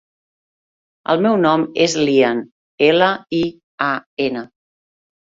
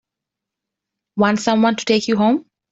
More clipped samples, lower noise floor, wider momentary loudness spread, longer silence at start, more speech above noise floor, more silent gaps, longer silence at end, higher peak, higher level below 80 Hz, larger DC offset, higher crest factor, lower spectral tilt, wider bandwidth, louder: neither; first, under -90 dBFS vs -84 dBFS; first, 9 LU vs 5 LU; about the same, 1.1 s vs 1.15 s; first, over 74 dB vs 68 dB; first, 2.51-2.78 s, 3.64-3.78 s, 4.06-4.17 s vs none; first, 0.95 s vs 0.3 s; about the same, -2 dBFS vs -2 dBFS; about the same, -60 dBFS vs -60 dBFS; neither; about the same, 18 dB vs 16 dB; about the same, -4.5 dB/octave vs -5 dB/octave; about the same, 7.8 kHz vs 8 kHz; about the same, -17 LUFS vs -17 LUFS